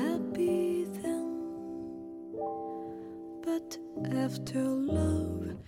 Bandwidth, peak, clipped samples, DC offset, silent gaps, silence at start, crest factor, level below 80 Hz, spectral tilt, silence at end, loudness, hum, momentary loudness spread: 16.5 kHz; -18 dBFS; under 0.1%; under 0.1%; none; 0 s; 14 dB; -52 dBFS; -7 dB/octave; 0 s; -34 LUFS; none; 12 LU